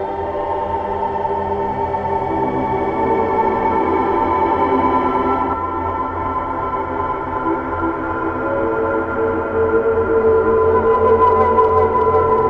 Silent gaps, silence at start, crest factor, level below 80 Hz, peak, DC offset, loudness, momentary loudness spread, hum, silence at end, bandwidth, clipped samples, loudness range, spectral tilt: none; 0 s; 14 dB; -38 dBFS; -2 dBFS; under 0.1%; -17 LUFS; 8 LU; none; 0 s; 5.6 kHz; under 0.1%; 6 LU; -9 dB/octave